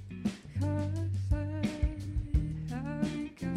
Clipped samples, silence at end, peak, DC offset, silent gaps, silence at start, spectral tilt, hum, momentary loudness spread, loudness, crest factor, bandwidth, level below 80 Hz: under 0.1%; 0 s; -16 dBFS; under 0.1%; none; 0 s; -7.5 dB/octave; none; 5 LU; -34 LUFS; 16 dB; 11.5 kHz; -38 dBFS